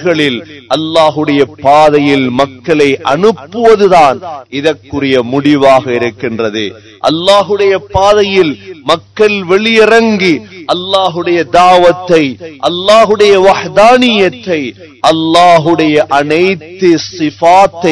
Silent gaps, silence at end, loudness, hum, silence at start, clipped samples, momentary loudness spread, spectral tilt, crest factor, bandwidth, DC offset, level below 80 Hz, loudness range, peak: none; 0 s; -8 LUFS; none; 0 s; 5%; 10 LU; -5 dB/octave; 8 dB; 11 kHz; 0.3%; -42 dBFS; 3 LU; 0 dBFS